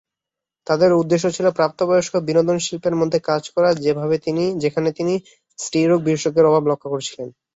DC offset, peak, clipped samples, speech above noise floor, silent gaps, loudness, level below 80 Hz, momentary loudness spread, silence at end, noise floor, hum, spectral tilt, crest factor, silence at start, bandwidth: under 0.1%; -2 dBFS; under 0.1%; 68 dB; none; -19 LUFS; -60 dBFS; 9 LU; 0.25 s; -86 dBFS; none; -5.5 dB/octave; 16 dB; 0.7 s; 8 kHz